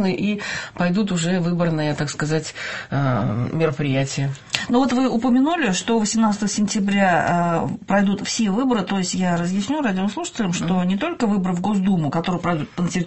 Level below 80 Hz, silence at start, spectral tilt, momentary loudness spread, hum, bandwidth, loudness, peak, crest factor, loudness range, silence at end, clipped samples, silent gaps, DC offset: -52 dBFS; 0 s; -5.5 dB/octave; 6 LU; none; 8.6 kHz; -21 LUFS; 0 dBFS; 20 dB; 3 LU; 0 s; under 0.1%; none; 0.5%